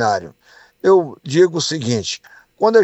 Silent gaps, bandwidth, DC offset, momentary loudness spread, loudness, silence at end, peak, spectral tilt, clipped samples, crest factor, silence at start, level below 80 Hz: none; 8.4 kHz; under 0.1%; 9 LU; -17 LUFS; 0 s; -2 dBFS; -4.5 dB/octave; under 0.1%; 16 dB; 0 s; -62 dBFS